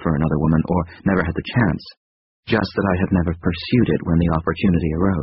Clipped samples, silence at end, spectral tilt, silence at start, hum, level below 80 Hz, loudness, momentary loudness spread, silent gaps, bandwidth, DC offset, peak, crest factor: under 0.1%; 0 s; -6.5 dB/octave; 0 s; none; -34 dBFS; -20 LUFS; 4 LU; 1.97-2.43 s; 5.8 kHz; under 0.1%; -2 dBFS; 16 dB